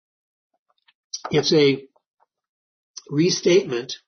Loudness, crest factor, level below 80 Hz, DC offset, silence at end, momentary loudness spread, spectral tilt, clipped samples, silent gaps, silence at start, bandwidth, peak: -20 LUFS; 18 dB; -66 dBFS; under 0.1%; 0.1 s; 18 LU; -4.5 dB/octave; under 0.1%; 2.07-2.17 s, 2.49-2.94 s; 1.15 s; 6.6 kHz; -6 dBFS